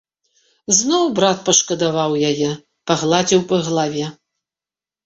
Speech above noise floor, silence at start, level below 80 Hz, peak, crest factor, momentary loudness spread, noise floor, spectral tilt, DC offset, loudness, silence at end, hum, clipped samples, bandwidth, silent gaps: over 73 dB; 0.7 s; -58 dBFS; 0 dBFS; 18 dB; 10 LU; under -90 dBFS; -3.5 dB/octave; under 0.1%; -17 LUFS; 0.95 s; none; under 0.1%; 8.2 kHz; none